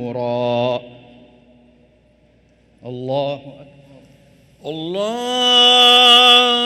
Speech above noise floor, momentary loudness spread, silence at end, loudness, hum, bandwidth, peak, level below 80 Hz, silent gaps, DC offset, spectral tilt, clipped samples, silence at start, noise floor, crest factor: 39 dB; 23 LU; 0 s; -12 LUFS; none; 16.5 kHz; 0 dBFS; -60 dBFS; none; under 0.1%; -2.5 dB/octave; under 0.1%; 0 s; -54 dBFS; 18 dB